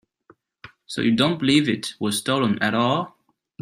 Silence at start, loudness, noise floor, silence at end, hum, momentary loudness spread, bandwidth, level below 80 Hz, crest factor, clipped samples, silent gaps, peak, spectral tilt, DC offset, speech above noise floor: 0.65 s; -21 LUFS; -58 dBFS; 0.55 s; none; 7 LU; 15.5 kHz; -60 dBFS; 18 dB; under 0.1%; none; -4 dBFS; -4.5 dB/octave; under 0.1%; 37 dB